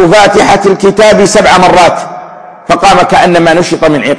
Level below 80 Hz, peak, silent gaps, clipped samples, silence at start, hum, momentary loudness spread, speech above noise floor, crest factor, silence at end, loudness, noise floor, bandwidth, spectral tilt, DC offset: -32 dBFS; 0 dBFS; none; 5%; 0 s; none; 10 LU; 22 dB; 6 dB; 0 s; -5 LUFS; -27 dBFS; 11 kHz; -4.5 dB/octave; 2%